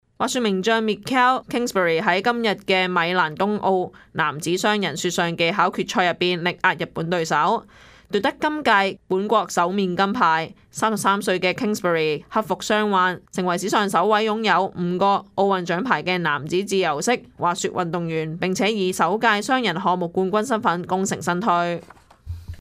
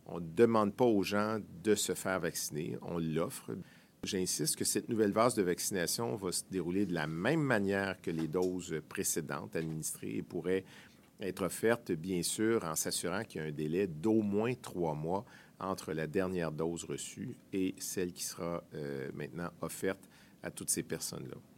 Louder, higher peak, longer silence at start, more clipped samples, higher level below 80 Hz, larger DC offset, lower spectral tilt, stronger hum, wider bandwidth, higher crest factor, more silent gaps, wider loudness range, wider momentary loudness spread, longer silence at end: first, -21 LUFS vs -35 LUFS; first, -2 dBFS vs -14 dBFS; about the same, 0.2 s vs 0.1 s; neither; first, -56 dBFS vs -68 dBFS; neither; about the same, -4.5 dB/octave vs -4.5 dB/octave; neither; about the same, 15.5 kHz vs 16.5 kHz; about the same, 18 dB vs 22 dB; neither; second, 1 LU vs 6 LU; second, 6 LU vs 11 LU; about the same, 0.05 s vs 0.15 s